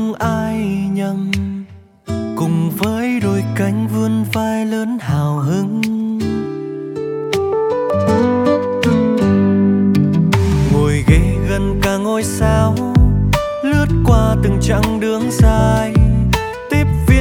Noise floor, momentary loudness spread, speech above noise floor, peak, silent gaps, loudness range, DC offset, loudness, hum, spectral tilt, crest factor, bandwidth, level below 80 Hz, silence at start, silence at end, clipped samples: -34 dBFS; 7 LU; 20 dB; 0 dBFS; none; 5 LU; under 0.1%; -16 LUFS; none; -7 dB/octave; 14 dB; 18 kHz; -24 dBFS; 0 s; 0 s; under 0.1%